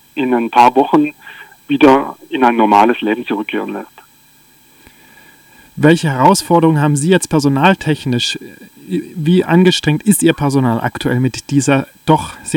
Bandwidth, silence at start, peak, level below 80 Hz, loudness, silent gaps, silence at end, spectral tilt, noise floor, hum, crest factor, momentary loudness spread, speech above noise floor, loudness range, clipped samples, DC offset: 18.5 kHz; 0.15 s; 0 dBFS; -48 dBFS; -13 LUFS; none; 0 s; -5.5 dB/octave; -48 dBFS; none; 14 dB; 11 LU; 35 dB; 4 LU; under 0.1%; under 0.1%